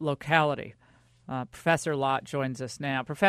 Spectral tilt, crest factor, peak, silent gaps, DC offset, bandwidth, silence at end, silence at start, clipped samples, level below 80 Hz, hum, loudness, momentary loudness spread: -5 dB/octave; 22 dB; -6 dBFS; none; under 0.1%; 13.5 kHz; 0 s; 0 s; under 0.1%; -64 dBFS; none; -29 LUFS; 12 LU